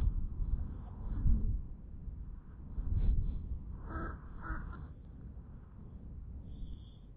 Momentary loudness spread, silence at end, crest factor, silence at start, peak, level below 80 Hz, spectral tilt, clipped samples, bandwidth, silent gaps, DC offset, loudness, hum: 16 LU; 0 s; 18 dB; 0 s; -18 dBFS; -38 dBFS; -9 dB/octave; under 0.1%; 3.9 kHz; none; under 0.1%; -42 LUFS; none